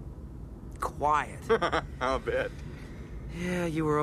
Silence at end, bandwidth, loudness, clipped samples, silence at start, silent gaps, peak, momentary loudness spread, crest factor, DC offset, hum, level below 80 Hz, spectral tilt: 0 s; 14 kHz; -30 LUFS; under 0.1%; 0 s; none; -14 dBFS; 17 LU; 18 dB; under 0.1%; none; -44 dBFS; -6 dB/octave